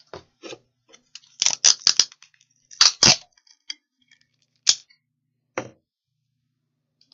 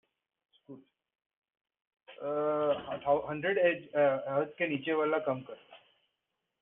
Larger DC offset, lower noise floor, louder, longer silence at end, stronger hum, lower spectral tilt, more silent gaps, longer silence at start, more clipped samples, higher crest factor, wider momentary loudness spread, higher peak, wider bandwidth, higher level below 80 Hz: neither; second, -79 dBFS vs -85 dBFS; first, -17 LUFS vs -31 LUFS; first, 1.5 s vs 0.85 s; neither; second, 0.5 dB/octave vs -4 dB/octave; second, none vs 1.26-1.30 s, 1.36-1.42 s; second, 0.15 s vs 0.7 s; neither; first, 26 dB vs 18 dB; first, 23 LU vs 9 LU; first, 0 dBFS vs -16 dBFS; first, 12 kHz vs 3.9 kHz; first, -60 dBFS vs -74 dBFS